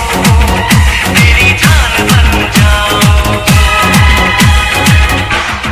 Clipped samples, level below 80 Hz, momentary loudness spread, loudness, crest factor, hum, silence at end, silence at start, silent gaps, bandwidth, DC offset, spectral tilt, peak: 1%; -12 dBFS; 3 LU; -7 LUFS; 8 dB; none; 0 s; 0 s; none; 16 kHz; under 0.1%; -4 dB/octave; 0 dBFS